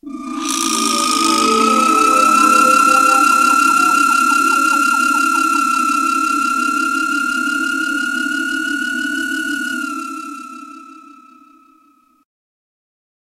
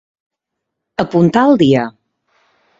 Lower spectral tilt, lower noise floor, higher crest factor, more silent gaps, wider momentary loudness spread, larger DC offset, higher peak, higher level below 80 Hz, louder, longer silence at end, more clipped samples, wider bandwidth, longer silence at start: second, -1 dB/octave vs -7.5 dB/octave; second, -54 dBFS vs -77 dBFS; about the same, 16 dB vs 16 dB; neither; second, 12 LU vs 15 LU; neither; about the same, 0 dBFS vs 0 dBFS; second, -58 dBFS vs -52 dBFS; about the same, -14 LUFS vs -12 LUFS; first, 2.45 s vs 0.9 s; neither; first, 16 kHz vs 7.8 kHz; second, 0.05 s vs 1 s